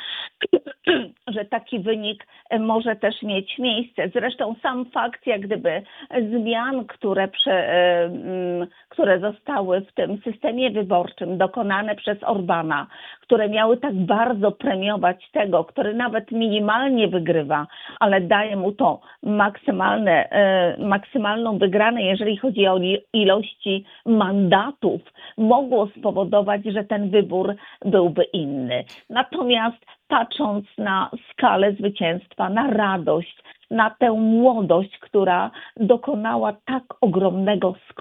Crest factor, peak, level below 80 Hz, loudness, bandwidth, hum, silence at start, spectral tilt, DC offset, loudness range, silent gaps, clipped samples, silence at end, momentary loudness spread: 20 dB; 0 dBFS; -66 dBFS; -21 LUFS; 4.1 kHz; none; 0 s; -8.5 dB/octave; under 0.1%; 4 LU; none; under 0.1%; 0 s; 8 LU